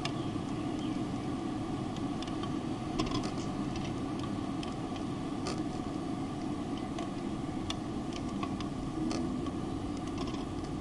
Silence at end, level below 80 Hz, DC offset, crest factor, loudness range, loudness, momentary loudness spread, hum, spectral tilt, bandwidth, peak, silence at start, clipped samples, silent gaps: 0 s; -50 dBFS; under 0.1%; 20 dB; 1 LU; -36 LUFS; 3 LU; none; -6 dB/octave; 11.5 kHz; -16 dBFS; 0 s; under 0.1%; none